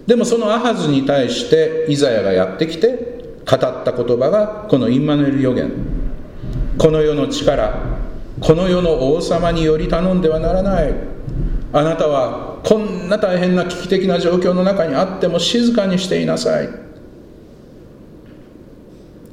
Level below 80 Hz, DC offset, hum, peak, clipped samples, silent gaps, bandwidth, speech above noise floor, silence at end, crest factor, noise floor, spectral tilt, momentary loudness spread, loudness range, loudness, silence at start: -30 dBFS; under 0.1%; none; 0 dBFS; under 0.1%; none; 12 kHz; 25 dB; 0.05 s; 16 dB; -40 dBFS; -6 dB/octave; 11 LU; 2 LU; -16 LUFS; 0 s